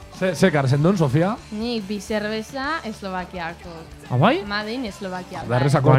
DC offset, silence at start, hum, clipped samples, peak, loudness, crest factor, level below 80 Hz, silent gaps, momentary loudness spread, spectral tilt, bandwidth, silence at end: under 0.1%; 0 s; none; under 0.1%; 0 dBFS; -22 LUFS; 22 dB; -46 dBFS; none; 13 LU; -6.5 dB/octave; 14.5 kHz; 0 s